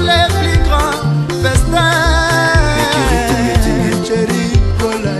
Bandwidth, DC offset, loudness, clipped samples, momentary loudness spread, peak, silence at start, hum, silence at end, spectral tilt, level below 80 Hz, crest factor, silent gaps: 13 kHz; under 0.1%; -13 LUFS; under 0.1%; 4 LU; 0 dBFS; 0 s; none; 0 s; -5 dB/octave; -18 dBFS; 12 dB; none